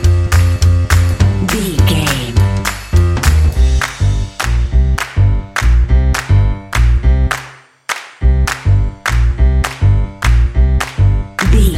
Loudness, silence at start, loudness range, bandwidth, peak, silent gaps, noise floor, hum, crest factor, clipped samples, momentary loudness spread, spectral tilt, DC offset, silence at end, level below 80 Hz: -14 LUFS; 0 s; 2 LU; 16 kHz; 0 dBFS; none; -35 dBFS; none; 12 dB; under 0.1%; 5 LU; -5.5 dB/octave; under 0.1%; 0 s; -14 dBFS